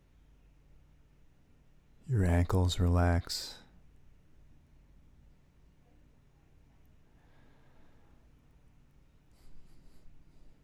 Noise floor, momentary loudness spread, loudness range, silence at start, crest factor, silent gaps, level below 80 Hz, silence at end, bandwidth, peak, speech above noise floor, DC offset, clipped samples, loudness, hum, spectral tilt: -62 dBFS; 18 LU; 8 LU; 2.1 s; 22 dB; none; -48 dBFS; 0.15 s; 15 kHz; -16 dBFS; 34 dB; under 0.1%; under 0.1%; -31 LUFS; none; -6 dB/octave